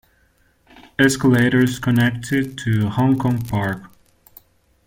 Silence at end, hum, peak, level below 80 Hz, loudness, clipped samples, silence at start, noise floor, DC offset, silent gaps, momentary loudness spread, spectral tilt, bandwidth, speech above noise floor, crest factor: 1 s; none; -2 dBFS; -48 dBFS; -18 LUFS; under 0.1%; 1 s; -59 dBFS; under 0.1%; none; 8 LU; -6 dB/octave; 17 kHz; 42 dB; 18 dB